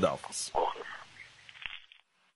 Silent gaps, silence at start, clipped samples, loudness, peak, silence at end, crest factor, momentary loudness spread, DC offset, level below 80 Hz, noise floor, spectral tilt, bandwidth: none; 0 s; under 0.1%; -36 LUFS; -14 dBFS; 0.5 s; 24 dB; 18 LU; under 0.1%; -62 dBFS; -63 dBFS; -3 dB/octave; 11.5 kHz